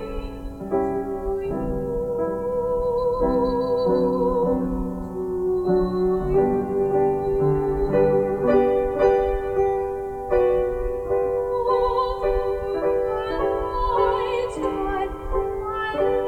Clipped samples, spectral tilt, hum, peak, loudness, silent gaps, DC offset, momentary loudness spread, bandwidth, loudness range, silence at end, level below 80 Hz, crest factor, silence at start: under 0.1%; -8 dB/octave; none; -6 dBFS; -23 LUFS; none; under 0.1%; 7 LU; 9.2 kHz; 3 LU; 0 s; -36 dBFS; 16 dB; 0 s